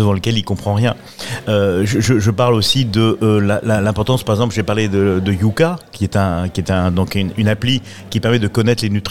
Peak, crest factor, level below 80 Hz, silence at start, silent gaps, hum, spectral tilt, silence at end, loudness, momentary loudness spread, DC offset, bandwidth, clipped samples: -2 dBFS; 14 dB; -44 dBFS; 0 s; none; none; -6 dB/octave; 0 s; -16 LUFS; 6 LU; 1%; 15.5 kHz; under 0.1%